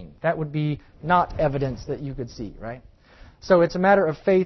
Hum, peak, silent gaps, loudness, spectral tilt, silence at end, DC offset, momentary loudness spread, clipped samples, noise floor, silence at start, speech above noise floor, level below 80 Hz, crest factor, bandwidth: none; -6 dBFS; none; -23 LUFS; -7.5 dB/octave; 0 s; under 0.1%; 17 LU; under 0.1%; -50 dBFS; 0 s; 27 dB; -44 dBFS; 18 dB; 6.2 kHz